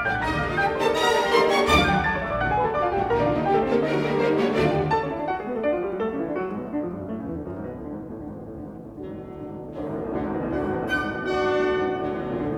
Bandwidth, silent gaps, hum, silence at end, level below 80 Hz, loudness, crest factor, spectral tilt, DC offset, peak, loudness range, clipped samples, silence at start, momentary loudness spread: 16.5 kHz; none; none; 0 s; -42 dBFS; -24 LUFS; 18 dB; -5.5 dB/octave; under 0.1%; -6 dBFS; 12 LU; under 0.1%; 0 s; 16 LU